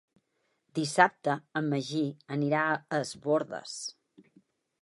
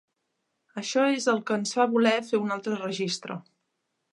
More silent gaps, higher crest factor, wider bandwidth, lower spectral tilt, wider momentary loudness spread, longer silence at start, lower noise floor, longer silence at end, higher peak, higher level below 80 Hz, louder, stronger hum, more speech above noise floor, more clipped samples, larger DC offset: neither; first, 26 dB vs 20 dB; about the same, 11.5 kHz vs 11.5 kHz; about the same, -5 dB/octave vs -4 dB/octave; about the same, 13 LU vs 13 LU; about the same, 0.75 s vs 0.75 s; about the same, -77 dBFS vs -79 dBFS; first, 0.9 s vs 0.7 s; about the same, -6 dBFS vs -8 dBFS; about the same, -78 dBFS vs -80 dBFS; second, -30 LUFS vs -26 LUFS; neither; second, 47 dB vs 53 dB; neither; neither